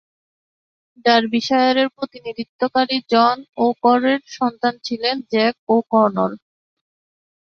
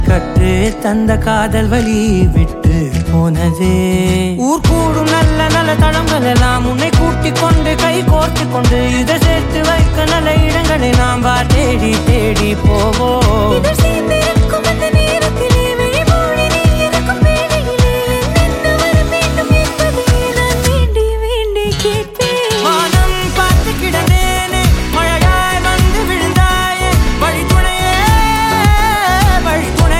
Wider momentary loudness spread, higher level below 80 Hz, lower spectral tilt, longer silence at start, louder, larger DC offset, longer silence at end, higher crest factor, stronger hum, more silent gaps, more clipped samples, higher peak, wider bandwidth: first, 8 LU vs 3 LU; second, -66 dBFS vs -16 dBFS; about the same, -5 dB/octave vs -5 dB/octave; first, 1.05 s vs 0 s; second, -18 LUFS vs -12 LUFS; neither; first, 1.1 s vs 0 s; first, 18 dB vs 12 dB; neither; first, 2.49-2.59 s, 3.49-3.53 s, 5.59-5.67 s vs none; neither; about the same, -2 dBFS vs 0 dBFS; second, 6.8 kHz vs 16.5 kHz